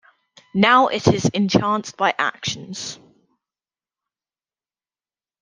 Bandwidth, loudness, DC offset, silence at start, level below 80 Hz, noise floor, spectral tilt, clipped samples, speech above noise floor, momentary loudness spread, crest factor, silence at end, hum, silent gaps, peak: 10 kHz; -19 LUFS; under 0.1%; 0.55 s; -58 dBFS; under -90 dBFS; -4.5 dB/octave; under 0.1%; over 71 dB; 15 LU; 22 dB; 2.45 s; none; none; 0 dBFS